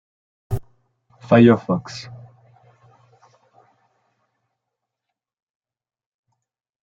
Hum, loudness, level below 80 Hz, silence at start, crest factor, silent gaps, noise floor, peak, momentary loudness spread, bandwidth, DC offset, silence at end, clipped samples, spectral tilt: none; -18 LUFS; -50 dBFS; 0.5 s; 24 dB; none; -83 dBFS; -2 dBFS; 22 LU; 7.6 kHz; under 0.1%; 4.7 s; under 0.1%; -8 dB/octave